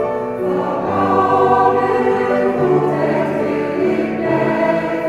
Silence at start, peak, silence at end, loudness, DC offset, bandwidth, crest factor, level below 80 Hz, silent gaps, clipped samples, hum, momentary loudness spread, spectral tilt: 0 s; -2 dBFS; 0 s; -16 LUFS; under 0.1%; 12 kHz; 14 dB; -52 dBFS; none; under 0.1%; none; 6 LU; -8 dB/octave